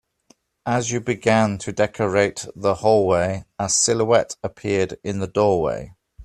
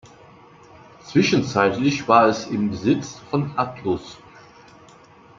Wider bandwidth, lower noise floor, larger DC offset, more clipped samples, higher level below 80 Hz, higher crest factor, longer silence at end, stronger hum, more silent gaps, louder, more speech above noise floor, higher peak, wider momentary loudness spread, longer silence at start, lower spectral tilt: first, 13 kHz vs 7.6 kHz; first, -59 dBFS vs -49 dBFS; neither; neither; first, -52 dBFS vs -58 dBFS; about the same, 20 dB vs 22 dB; second, 0 s vs 1.25 s; neither; neither; about the same, -21 LUFS vs -21 LUFS; first, 39 dB vs 28 dB; about the same, -2 dBFS vs -2 dBFS; about the same, 9 LU vs 11 LU; second, 0.65 s vs 1.05 s; second, -4 dB/octave vs -5.5 dB/octave